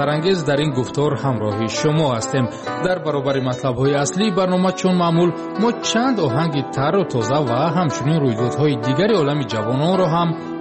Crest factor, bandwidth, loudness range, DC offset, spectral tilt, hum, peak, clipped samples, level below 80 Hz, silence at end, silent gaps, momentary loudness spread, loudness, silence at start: 12 dB; 8.8 kHz; 2 LU; under 0.1%; -6 dB/octave; none; -6 dBFS; under 0.1%; -52 dBFS; 0 s; none; 4 LU; -19 LUFS; 0 s